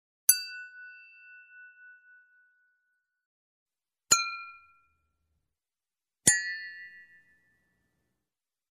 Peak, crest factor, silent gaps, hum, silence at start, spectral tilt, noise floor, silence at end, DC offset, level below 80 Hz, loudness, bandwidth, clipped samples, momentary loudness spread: -4 dBFS; 32 dB; 3.26-3.66 s; none; 0.3 s; 0.5 dB/octave; under -90 dBFS; 1.7 s; under 0.1%; -72 dBFS; -26 LUFS; 13.5 kHz; under 0.1%; 24 LU